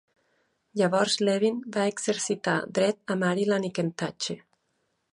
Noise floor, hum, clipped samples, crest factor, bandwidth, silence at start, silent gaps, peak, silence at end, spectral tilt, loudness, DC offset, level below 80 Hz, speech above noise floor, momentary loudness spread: -75 dBFS; none; under 0.1%; 18 dB; 11.5 kHz; 0.75 s; none; -10 dBFS; 0.75 s; -4.5 dB/octave; -27 LUFS; under 0.1%; -74 dBFS; 49 dB; 8 LU